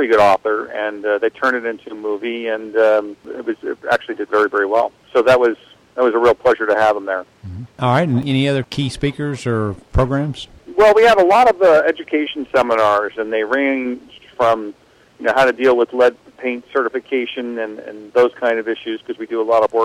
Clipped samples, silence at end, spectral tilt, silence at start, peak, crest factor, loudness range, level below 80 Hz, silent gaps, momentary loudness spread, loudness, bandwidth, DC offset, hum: under 0.1%; 0 s; -6.5 dB/octave; 0 s; -4 dBFS; 12 dB; 5 LU; -40 dBFS; none; 13 LU; -17 LUFS; 13.5 kHz; under 0.1%; none